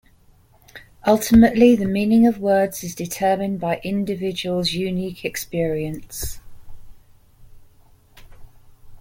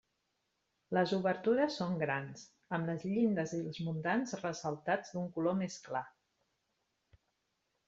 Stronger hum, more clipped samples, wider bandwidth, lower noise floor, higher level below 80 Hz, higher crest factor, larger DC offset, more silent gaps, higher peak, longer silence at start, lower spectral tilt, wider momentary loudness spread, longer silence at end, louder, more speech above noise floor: neither; neither; first, 17 kHz vs 8 kHz; second, -53 dBFS vs -82 dBFS; first, -42 dBFS vs -76 dBFS; about the same, 18 dB vs 20 dB; neither; neither; first, -2 dBFS vs -18 dBFS; second, 0.75 s vs 0.9 s; about the same, -5.5 dB/octave vs -6 dB/octave; first, 15 LU vs 9 LU; second, 0 s vs 1.8 s; first, -20 LUFS vs -36 LUFS; second, 35 dB vs 47 dB